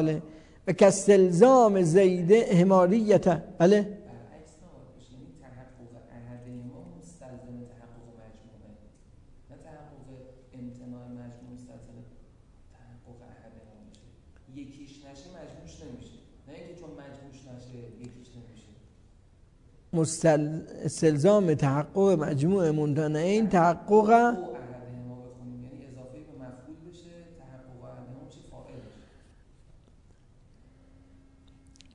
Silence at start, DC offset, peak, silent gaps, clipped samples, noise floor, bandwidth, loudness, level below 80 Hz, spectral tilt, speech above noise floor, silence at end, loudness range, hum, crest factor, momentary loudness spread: 0 s; under 0.1%; -4 dBFS; none; under 0.1%; -57 dBFS; 11 kHz; -23 LUFS; -58 dBFS; -6.5 dB/octave; 35 dB; 3.15 s; 27 LU; none; 24 dB; 27 LU